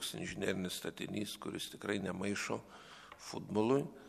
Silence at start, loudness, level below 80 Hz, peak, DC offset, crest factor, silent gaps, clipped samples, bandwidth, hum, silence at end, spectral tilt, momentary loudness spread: 0 s; -39 LUFS; -70 dBFS; -18 dBFS; under 0.1%; 20 dB; none; under 0.1%; 14 kHz; none; 0 s; -4.5 dB/octave; 15 LU